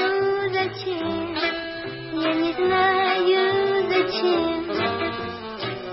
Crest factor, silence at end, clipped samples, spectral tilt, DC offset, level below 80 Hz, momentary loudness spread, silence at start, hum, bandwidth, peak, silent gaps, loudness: 14 dB; 0 s; under 0.1%; -8.5 dB/octave; under 0.1%; -56 dBFS; 11 LU; 0 s; none; 5.8 kHz; -8 dBFS; none; -23 LUFS